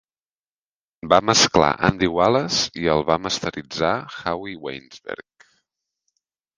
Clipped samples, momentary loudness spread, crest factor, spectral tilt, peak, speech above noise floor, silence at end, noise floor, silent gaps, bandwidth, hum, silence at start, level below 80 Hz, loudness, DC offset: under 0.1%; 19 LU; 22 dB; -3.5 dB/octave; 0 dBFS; over 69 dB; 1.35 s; under -90 dBFS; none; 10.5 kHz; none; 1.05 s; -48 dBFS; -20 LUFS; under 0.1%